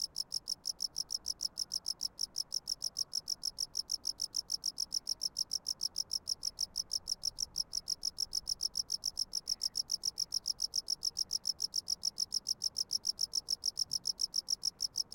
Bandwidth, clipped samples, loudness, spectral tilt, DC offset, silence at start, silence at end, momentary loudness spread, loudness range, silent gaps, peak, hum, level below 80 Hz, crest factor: 17 kHz; under 0.1%; -35 LUFS; 1.5 dB/octave; under 0.1%; 0 s; 0.1 s; 3 LU; 2 LU; none; -22 dBFS; none; -66 dBFS; 16 dB